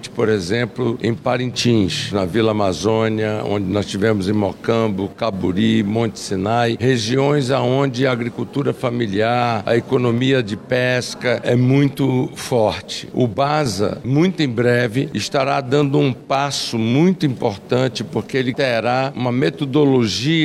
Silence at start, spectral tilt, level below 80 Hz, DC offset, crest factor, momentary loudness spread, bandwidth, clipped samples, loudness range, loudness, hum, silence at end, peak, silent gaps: 0 s; -6 dB/octave; -52 dBFS; under 0.1%; 14 dB; 5 LU; 13.5 kHz; under 0.1%; 1 LU; -18 LUFS; none; 0 s; -4 dBFS; none